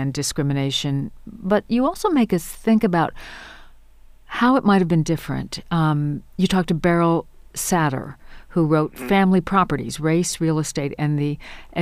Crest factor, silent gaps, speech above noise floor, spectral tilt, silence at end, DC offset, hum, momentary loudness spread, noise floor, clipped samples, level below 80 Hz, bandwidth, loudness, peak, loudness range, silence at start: 16 dB; none; 26 dB; -5.5 dB/octave; 0 s; under 0.1%; none; 12 LU; -46 dBFS; under 0.1%; -44 dBFS; 15.5 kHz; -21 LUFS; -4 dBFS; 2 LU; 0 s